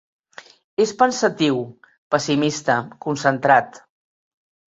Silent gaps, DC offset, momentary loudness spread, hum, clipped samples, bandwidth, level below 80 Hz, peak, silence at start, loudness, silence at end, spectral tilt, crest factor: 1.98-2.10 s; under 0.1%; 10 LU; none; under 0.1%; 8 kHz; -64 dBFS; -2 dBFS; 0.8 s; -20 LUFS; 0.9 s; -4.5 dB/octave; 20 dB